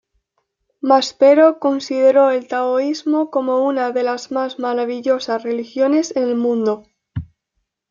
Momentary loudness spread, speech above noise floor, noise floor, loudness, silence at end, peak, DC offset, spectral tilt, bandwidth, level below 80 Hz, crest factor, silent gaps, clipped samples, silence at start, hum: 11 LU; 57 dB; -74 dBFS; -17 LUFS; 0.65 s; -2 dBFS; under 0.1%; -5 dB/octave; 7.4 kHz; -56 dBFS; 16 dB; none; under 0.1%; 0.85 s; none